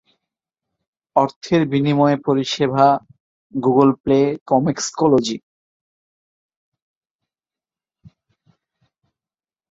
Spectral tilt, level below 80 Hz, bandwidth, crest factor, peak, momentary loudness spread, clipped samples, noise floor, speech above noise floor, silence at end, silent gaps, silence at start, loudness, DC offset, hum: -6 dB/octave; -58 dBFS; 7.8 kHz; 18 dB; -2 dBFS; 7 LU; under 0.1%; under -90 dBFS; over 73 dB; 4.35 s; 1.36-1.41 s, 3.20-3.50 s, 4.00-4.04 s, 4.41-4.46 s; 1.15 s; -18 LUFS; under 0.1%; none